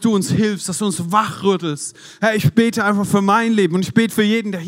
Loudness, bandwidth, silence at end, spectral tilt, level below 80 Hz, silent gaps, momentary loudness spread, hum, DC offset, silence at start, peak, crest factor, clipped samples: -17 LUFS; 16 kHz; 0 s; -5 dB/octave; -58 dBFS; none; 6 LU; none; under 0.1%; 0 s; 0 dBFS; 16 dB; under 0.1%